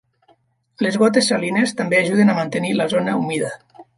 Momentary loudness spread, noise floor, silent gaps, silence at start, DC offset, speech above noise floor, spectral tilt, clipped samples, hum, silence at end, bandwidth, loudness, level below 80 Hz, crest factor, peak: 8 LU; -59 dBFS; none; 0.8 s; under 0.1%; 41 dB; -5 dB/octave; under 0.1%; none; 0.15 s; 11.5 kHz; -18 LUFS; -66 dBFS; 16 dB; -2 dBFS